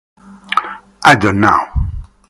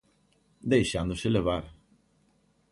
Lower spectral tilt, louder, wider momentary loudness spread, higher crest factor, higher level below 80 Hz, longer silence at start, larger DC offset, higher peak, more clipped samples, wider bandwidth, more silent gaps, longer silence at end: about the same, -5 dB/octave vs -6 dB/octave; first, -13 LUFS vs -28 LUFS; about the same, 13 LU vs 12 LU; second, 14 dB vs 20 dB; first, -28 dBFS vs -48 dBFS; second, 0.3 s vs 0.65 s; neither; first, 0 dBFS vs -10 dBFS; first, 0.6% vs under 0.1%; first, 16 kHz vs 11.5 kHz; neither; second, 0.25 s vs 1 s